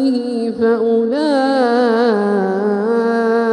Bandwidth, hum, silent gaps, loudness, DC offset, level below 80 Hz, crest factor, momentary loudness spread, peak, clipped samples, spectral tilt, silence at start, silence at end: 10 kHz; none; none; -15 LUFS; under 0.1%; -64 dBFS; 12 dB; 3 LU; -2 dBFS; under 0.1%; -6.5 dB/octave; 0 s; 0 s